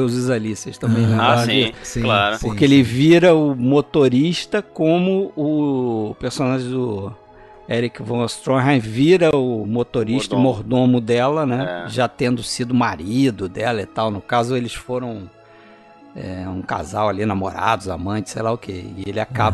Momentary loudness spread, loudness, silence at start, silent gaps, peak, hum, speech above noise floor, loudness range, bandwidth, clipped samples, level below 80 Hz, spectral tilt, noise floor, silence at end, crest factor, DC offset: 12 LU; -19 LUFS; 0 s; none; 0 dBFS; none; 28 dB; 9 LU; 12.5 kHz; under 0.1%; -46 dBFS; -6 dB/octave; -46 dBFS; 0 s; 18 dB; under 0.1%